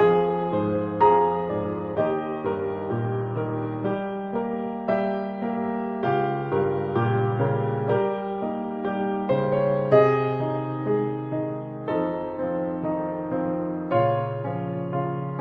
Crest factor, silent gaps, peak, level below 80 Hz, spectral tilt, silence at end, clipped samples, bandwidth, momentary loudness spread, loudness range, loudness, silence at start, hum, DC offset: 20 dB; none; -4 dBFS; -58 dBFS; -10 dB/octave; 0 s; under 0.1%; 5.2 kHz; 8 LU; 4 LU; -25 LUFS; 0 s; none; under 0.1%